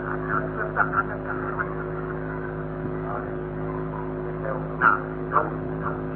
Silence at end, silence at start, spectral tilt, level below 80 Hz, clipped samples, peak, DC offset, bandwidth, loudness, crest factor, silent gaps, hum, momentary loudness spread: 0 s; 0 s; -7 dB/octave; -44 dBFS; under 0.1%; -6 dBFS; under 0.1%; 4.3 kHz; -27 LUFS; 22 dB; none; none; 10 LU